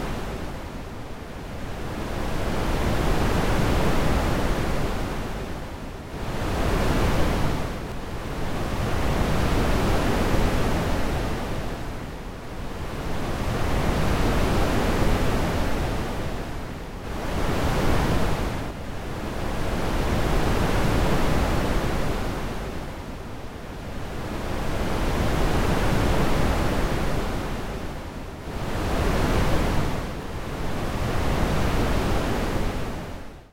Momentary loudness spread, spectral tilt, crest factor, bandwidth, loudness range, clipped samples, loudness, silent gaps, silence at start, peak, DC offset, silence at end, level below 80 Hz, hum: 12 LU; -6 dB/octave; 14 dB; 16 kHz; 3 LU; under 0.1%; -27 LUFS; none; 0 s; -8 dBFS; under 0.1%; 0.05 s; -28 dBFS; none